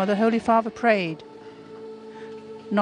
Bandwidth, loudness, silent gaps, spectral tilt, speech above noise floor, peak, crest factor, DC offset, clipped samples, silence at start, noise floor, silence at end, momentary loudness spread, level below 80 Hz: 10 kHz; -22 LUFS; none; -6.5 dB/octave; 21 dB; -6 dBFS; 18 dB; under 0.1%; under 0.1%; 0 s; -42 dBFS; 0 s; 21 LU; -64 dBFS